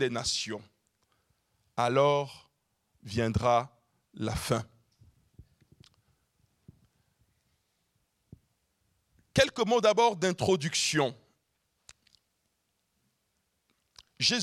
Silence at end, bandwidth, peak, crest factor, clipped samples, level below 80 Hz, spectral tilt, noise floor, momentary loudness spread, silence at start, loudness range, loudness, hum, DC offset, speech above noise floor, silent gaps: 0 s; 15 kHz; -10 dBFS; 24 dB; under 0.1%; -58 dBFS; -4 dB/octave; -78 dBFS; 13 LU; 0 s; 11 LU; -28 LUFS; none; under 0.1%; 50 dB; none